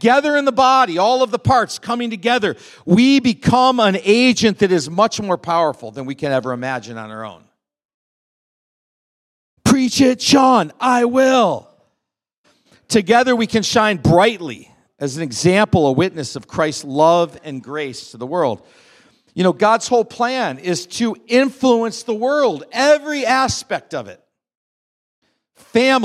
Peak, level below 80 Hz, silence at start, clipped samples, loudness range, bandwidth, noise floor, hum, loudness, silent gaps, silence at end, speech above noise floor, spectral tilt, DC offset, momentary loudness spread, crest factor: 0 dBFS; -52 dBFS; 0 s; under 0.1%; 6 LU; 14 kHz; -80 dBFS; none; -16 LUFS; 7.85-9.57 s, 12.37-12.44 s, 24.55-25.22 s; 0 s; 64 dB; -4.5 dB/octave; under 0.1%; 14 LU; 16 dB